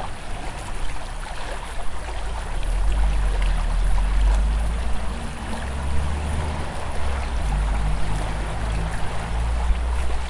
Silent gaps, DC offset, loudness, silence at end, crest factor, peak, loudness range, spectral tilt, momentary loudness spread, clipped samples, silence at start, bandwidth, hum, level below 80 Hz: none; under 0.1%; -27 LUFS; 0 s; 14 dB; -8 dBFS; 3 LU; -5.5 dB/octave; 9 LU; under 0.1%; 0 s; 11.5 kHz; none; -24 dBFS